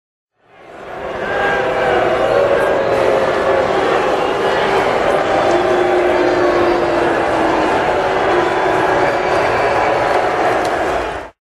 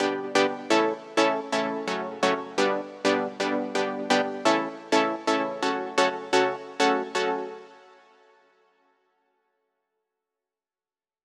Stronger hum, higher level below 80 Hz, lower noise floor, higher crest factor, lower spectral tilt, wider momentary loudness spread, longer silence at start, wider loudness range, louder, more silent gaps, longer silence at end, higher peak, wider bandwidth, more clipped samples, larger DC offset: neither; first, -40 dBFS vs -90 dBFS; second, -40 dBFS vs under -90 dBFS; second, 14 dB vs 20 dB; first, -5 dB/octave vs -3 dB/octave; about the same, 4 LU vs 5 LU; first, 0.6 s vs 0 s; second, 1 LU vs 6 LU; first, -15 LUFS vs -25 LUFS; neither; second, 0.25 s vs 3.5 s; first, -2 dBFS vs -8 dBFS; about the same, 13 kHz vs 13 kHz; neither; neither